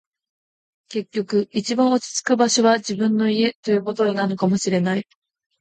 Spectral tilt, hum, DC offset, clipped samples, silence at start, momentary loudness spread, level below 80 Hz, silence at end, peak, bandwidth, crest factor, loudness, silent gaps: -4.5 dB/octave; none; under 0.1%; under 0.1%; 0.9 s; 8 LU; -66 dBFS; 0.6 s; -4 dBFS; 9.2 kHz; 16 dB; -20 LUFS; 3.55-3.63 s